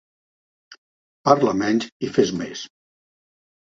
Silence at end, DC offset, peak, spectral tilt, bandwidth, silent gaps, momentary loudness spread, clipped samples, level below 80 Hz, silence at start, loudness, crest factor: 1.1 s; under 0.1%; 0 dBFS; -5.5 dB/octave; 7.8 kHz; 0.78-1.24 s, 1.92-2.00 s; 15 LU; under 0.1%; -60 dBFS; 0.7 s; -21 LUFS; 24 dB